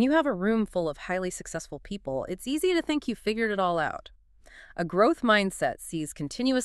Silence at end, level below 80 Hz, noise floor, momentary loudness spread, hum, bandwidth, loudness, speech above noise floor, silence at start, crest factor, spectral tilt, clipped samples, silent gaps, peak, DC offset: 0 s; -54 dBFS; -53 dBFS; 13 LU; none; 13.5 kHz; -28 LUFS; 26 dB; 0 s; 20 dB; -4.5 dB/octave; under 0.1%; none; -8 dBFS; under 0.1%